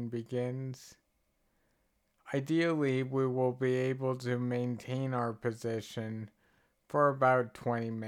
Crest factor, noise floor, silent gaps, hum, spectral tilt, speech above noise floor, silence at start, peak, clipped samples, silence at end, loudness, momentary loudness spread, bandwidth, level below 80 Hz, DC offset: 20 dB; -76 dBFS; none; none; -7.5 dB/octave; 44 dB; 0 s; -14 dBFS; under 0.1%; 0 s; -33 LUFS; 12 LU; 14 kHz; -76 dBFS; under 0.1%